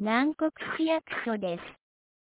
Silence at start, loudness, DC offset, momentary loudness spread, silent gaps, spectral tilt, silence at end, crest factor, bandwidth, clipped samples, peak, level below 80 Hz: 0 s; -30 LUFS; under 0.1%; 10 LU; none; -3.5 dB/octave; 0.55 s; 16 dB; 4 kHz; under 0.1%; -14 dBFS; -70 dBFS